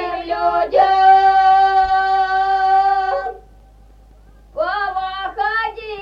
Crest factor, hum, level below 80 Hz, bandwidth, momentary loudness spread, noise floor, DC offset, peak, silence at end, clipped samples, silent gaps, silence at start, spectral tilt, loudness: 14 dB; none; -44 dBFS; 6.4 kHz; 13 LU; -45 dBFS; under 0.1%; -2 dBFS; 0 s; under 0.1%; none; 0 s; -4 dB/octave; -15 LUFS